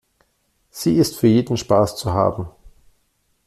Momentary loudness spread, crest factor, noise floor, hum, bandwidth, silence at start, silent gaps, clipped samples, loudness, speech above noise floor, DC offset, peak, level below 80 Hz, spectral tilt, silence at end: 16 LU; 18 dB; -66 dBFS; none; 14.5 kHz; 0.75 s; none; under 0.1%; -18 LUFS; 49 dB; under 0.1%; -2 dBFS; -48 dBFS; -6.5 dB/octave; 0.8 s